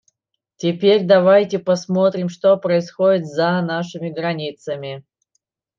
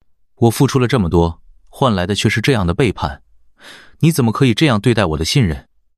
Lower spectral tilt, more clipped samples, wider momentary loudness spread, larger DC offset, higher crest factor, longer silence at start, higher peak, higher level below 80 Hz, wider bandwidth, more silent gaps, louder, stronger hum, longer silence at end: about the same, -6.5 dB/octave vs -6 dB/octave; neither; first, 14 LU vs 6 LU; second, under 0.1% vs 0.2%; about the same, 16 dB vs 14 dB; first, 0.6 s vs 0.4 s; about the same, -2 dBFS vs -2 dBFS; second, -70 dBFS vs -38 dBFS; second, 7.4 kHz vs 15 kHz; neither; second, -18 LUFS vs -15 LUFS; neither; first, 0.8 s vs 0.4 s